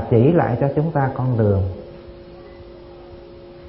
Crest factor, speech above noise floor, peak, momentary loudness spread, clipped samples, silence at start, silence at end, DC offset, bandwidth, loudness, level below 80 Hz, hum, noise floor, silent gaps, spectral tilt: 18 dB; 23 dB; -2 dBFS; 25 LU; under 0.1%; 0 s; 0 s; under 0.1%; 5.6 kHz; -19 LUFS; -44 dBFS; none; -40 dBFS; none; -13.5 dB/octave